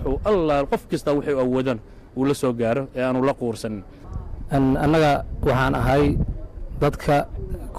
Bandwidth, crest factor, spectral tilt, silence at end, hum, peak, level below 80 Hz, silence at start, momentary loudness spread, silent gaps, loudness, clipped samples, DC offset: 15.5 kHz; 8 dB; -7 dB/octave; 0 s; none; -12 dBFS; -34 dBFS; 0 s; 16 LU; none; -22 LUFS; under 0.1%; under 0.1%